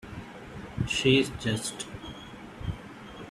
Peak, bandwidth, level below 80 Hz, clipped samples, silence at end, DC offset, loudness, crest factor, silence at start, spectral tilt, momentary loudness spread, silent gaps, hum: -8 dBFS; 14.5 kHz; -48 dBFS; under 0.1%; 0 s; under 0.1%; -28 LUFS; 22 dB; 0 s; -4.5 dB/octave; 20 LU; none; none